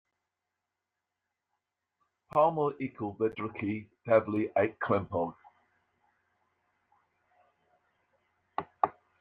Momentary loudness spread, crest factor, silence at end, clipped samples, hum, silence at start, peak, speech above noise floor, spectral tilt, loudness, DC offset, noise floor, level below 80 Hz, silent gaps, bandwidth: 11 LU; 24 dB; 0.3 s; under 0.1%; none; 2.35 s; -10 dBFS; 57 dB; -9.5 dB/octave; -31 LUFS; under 0.1%; -87 dBFS; -74 dBFS; none; 4.8 kHz